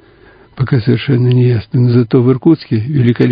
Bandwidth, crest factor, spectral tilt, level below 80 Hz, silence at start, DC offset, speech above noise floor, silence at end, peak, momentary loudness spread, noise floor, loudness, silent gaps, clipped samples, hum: 5.2 kHz; 12 dB; -11 dB/octave; -42 dBFS; 0.55 s; under 0.1%; 32 dB; 0 s; 0 dBFS; 4 LU; -43 dBFS; -12 LUFS; none; under 0.1%; none